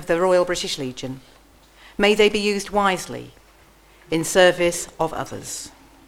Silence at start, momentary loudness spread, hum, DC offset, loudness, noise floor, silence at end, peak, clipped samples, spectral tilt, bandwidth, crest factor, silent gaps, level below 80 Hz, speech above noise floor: 0 s; 18 LU; none; under 0.1%; -20 LUFS; -52 dBFS; 0.4 s; -2 dBFS; under 0.1%; -3.5 dB/octave; 16.5 kHz; 20 dB; none; -48 dBFS; 31 dB